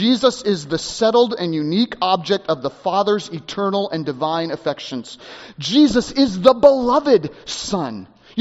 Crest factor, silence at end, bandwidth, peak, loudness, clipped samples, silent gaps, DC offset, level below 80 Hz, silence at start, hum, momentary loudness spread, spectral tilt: 18 dB; 0 s; 8 kHz; 0 dBFS; -18 LUFS; under 0.1%; none; under 0.1%; -50 dBFS; 0 s; none; 14 LU; -4 dB/octave